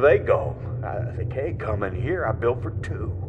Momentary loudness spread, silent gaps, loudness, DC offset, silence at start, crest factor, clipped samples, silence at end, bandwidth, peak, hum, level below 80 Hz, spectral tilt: 8 LU; none; -26 LUFS; under 0.1%; 0 s; 18 dB; under 0.1%; 0 s; 8.6 kHz; -6 dBFS; none; -40 dBFS; -9 dB/octave